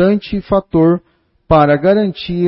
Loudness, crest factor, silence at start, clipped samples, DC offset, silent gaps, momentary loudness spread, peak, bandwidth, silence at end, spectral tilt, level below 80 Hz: -13 LUFS; 12 dB; 0 s; under 0.1%; under 0.1%; none; 7 LU; 0 dBFS; 5.8 kHz; 0 s; -12 dB/octave; -36 dBFS